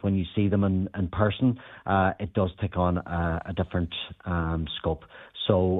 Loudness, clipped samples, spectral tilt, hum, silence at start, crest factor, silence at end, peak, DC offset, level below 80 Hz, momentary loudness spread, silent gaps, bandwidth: -27 LUFS; under 0.1%; -10.5 dB/octave; none; 0.05 s; 20 dB; 0 s; -6 dBFS; under 0.1%; -44 dBFS; 7 LU; none; 4 kHz